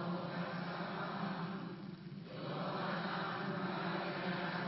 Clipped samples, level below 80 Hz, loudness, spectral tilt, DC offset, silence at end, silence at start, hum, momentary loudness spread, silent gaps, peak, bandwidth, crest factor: under 0.1%; -76 dBFS; -41 LUFS; -4.5 dB/octave; under 0.1%; 0 s; 0 s; none; 8 LU; none; -26 dBFS; 5.8 kHz; 14 dB